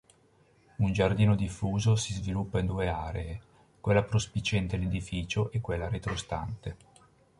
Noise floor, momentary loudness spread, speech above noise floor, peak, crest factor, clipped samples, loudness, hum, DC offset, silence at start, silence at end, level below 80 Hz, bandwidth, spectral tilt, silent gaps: -64 dBFS; 12 LU; 35 dB; -12 dBFS; 20 dB; under 0.1%; -30 LUFS; none; under 0.1%; 0.8 s; 0.65 s; -44 dBFS; 11.5 kHz; -6 dB/octave; none